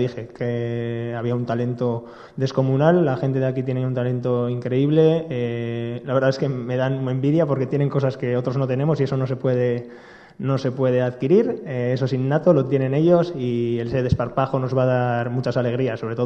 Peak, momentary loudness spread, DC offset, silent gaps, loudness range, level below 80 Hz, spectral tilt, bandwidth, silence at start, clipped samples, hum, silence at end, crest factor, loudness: -2 dBFS; 8 LU; under 0.1%; none; 2 LU; -52 dBFS; -9 dB/octave; 6.8 kHz; 0 s; under 0.1%; none; 0 s; 20 dB; -21 LUFS